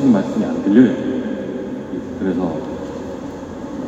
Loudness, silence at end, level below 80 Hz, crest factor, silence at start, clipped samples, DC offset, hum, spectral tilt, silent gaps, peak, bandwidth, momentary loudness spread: -19 LUFS; 0 s; -48 dBFS; 18 dB; 0 s; under 0.1%; under 0.1%; none; -8 dB/octave; none; 0 dBFS; 7.8 kHz; 16 LU